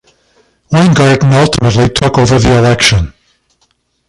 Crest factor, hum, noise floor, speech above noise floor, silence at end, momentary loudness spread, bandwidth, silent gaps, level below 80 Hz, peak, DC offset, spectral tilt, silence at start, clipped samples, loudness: 10 dB; none; -58 dBFS; 50 dB; 1 s; 5 LU; 11.5 kHz; none; -28 dBFS; 0 dBFS; under 0.1%; -5.5 dB/octave; 0.7 s; under 0.1%; -9 LUFS